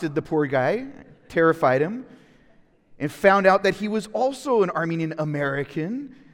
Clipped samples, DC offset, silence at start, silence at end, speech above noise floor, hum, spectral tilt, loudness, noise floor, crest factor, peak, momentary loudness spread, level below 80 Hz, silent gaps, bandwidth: under 0.1%; under 0.1%; 0 s; 0.2 s; 34 dB; none; -6.5 dB/octave; -22 LUFS; -56 dBFS; 20 dB; -2 dBFS; 13 LU; -58 dBFS; none; 17 kHz